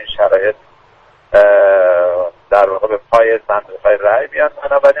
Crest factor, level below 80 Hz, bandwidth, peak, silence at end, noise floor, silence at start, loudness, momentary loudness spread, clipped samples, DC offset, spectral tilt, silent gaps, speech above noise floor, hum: 12 dB; -46 dBFS; 6.2 kHz; 0 dBFS; 0 s; -48 dBFS; 0 s; -12 LUFS; 9 LU; under 0.1%; under 0.1%; -4.5 dB/octave; none; 36 dB; none